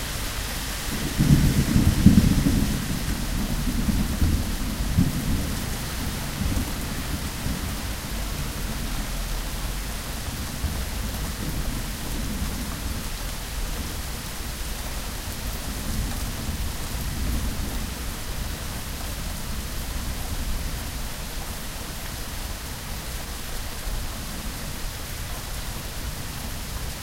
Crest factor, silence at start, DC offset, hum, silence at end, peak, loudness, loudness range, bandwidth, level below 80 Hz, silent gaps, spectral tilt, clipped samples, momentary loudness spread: 26 dB; 0 s; under 0.1%; none; 0 s; 0 dBFS; -28 LUFS; 11 LU; 16 kHz; -30 dBFS; none; -4.5 dB/octave; under 0.1%; 10 LU